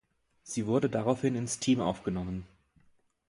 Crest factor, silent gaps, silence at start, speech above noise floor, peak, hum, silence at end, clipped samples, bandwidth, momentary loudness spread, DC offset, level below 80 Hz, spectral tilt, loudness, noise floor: 20 dB; none; 0.45 s; 37 dB; -12 dBFS; none; 0.85 s; under 0.1%; 11.5 kHz; 10 LU; under 0.1%; -56 dBFS; -5.5 dB/octave; -31 LUFS; -67 dBFS